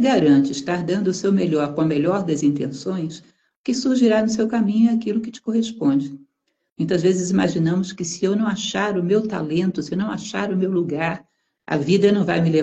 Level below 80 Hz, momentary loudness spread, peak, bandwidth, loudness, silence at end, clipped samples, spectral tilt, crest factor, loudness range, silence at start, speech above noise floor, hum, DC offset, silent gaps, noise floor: -58 dBFS; 9 LU; -4 dBFS; 8.6 kHz; -20 LUFS; 0 s; under 0.1%; -6 dB/octave; 16 dB; 2 LU; 0 s; 51 dB; none; under 0.1%; 3.56-3.64 s, 6.72-6.76 s; -71 dBFS